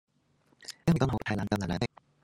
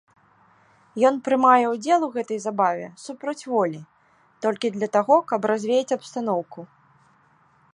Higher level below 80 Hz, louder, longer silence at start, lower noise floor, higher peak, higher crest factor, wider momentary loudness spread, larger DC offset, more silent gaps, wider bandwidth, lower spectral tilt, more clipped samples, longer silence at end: first, -52 dBFS vs -76 dBFS; second, -31 LUFS vs -22 LUFS; second, 0.6 s vs 0.95 s; first, -69 dBFS vs -60 dBFS; second, -12 dBFS vs -4 dBFS; about the same, 20 dB vs 20 dB; about the same, 14 LU vs 14 LU; neither; neither; first, 14.5 kHz vs 11 kHz; first, -6.5 dB/octave vs -5 dB/octave; neither; second, 0.4 s vs 1.1 s